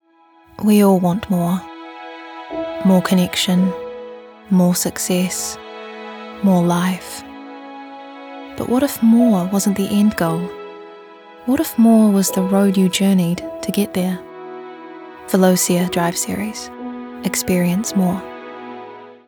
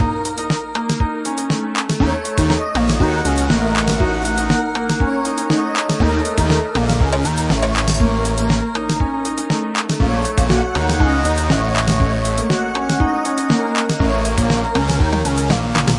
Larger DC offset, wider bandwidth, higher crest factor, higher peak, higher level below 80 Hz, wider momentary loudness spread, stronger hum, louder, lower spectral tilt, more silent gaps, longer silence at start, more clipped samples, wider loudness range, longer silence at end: neither; first, over 20 kHz vs 11.5 kHz; about the same, 16 dB vs 14 dB; about the same, -2 dBFS vs -2 dBFS; second, -54 dBFS vs -24 dBFS; first, 21 LU vs 4 LU; neither; about the same, -17 LUFS vs -18 LUFS; about the same, -5.5 dB/octave vs -5.5 dB/octave; neither; first, 0.6 s vs 0 s; neither; first, 4 LU vs 1 LU; first, 0.15 s vs 0 s